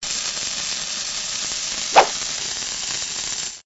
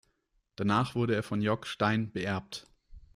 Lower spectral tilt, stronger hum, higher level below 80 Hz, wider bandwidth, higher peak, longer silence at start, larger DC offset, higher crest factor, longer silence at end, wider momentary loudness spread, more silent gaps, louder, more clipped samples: second, 0.5 dB/octave vs -6.5 dB/octave; neither; first, -52 dBFS vs -60 dBFS; second, 8.2 kHz vs 13.5 kHz; first, 0 dBFS vs -14 dBFS; second, 0 s vs 0.6 s; neither; first, 24 dB vs 18 dB; about the same, 0.05 s vs 0.15 s; about the same, 8 LU vs 8 LU; neither; first, -21 LUFS vs -31 LUFS; neither